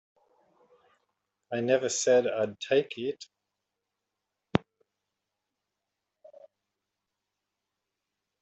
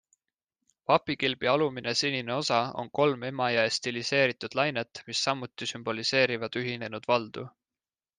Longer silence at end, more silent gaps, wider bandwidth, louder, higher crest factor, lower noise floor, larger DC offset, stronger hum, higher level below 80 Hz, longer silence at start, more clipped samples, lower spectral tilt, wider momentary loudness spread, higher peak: first, 3.85 s vs 0.7 s; neither; second, 8.2 kHz vs 9.8 kHz; about the same, -28 LUFS vs -28 LUFS; first, 30 dB vs 20 dB; second, -86 dBFS vs under -90 dBFS; neither; neither; first, -66 dBFS vs -72 dBFS; first, 1.5 s vs 0.9 s; neither; about the same, -4 dB/octave vs -3.5 dB/octave; first, 12 LU vs 9 LU; first, -4 dBFS vs -8 dBFS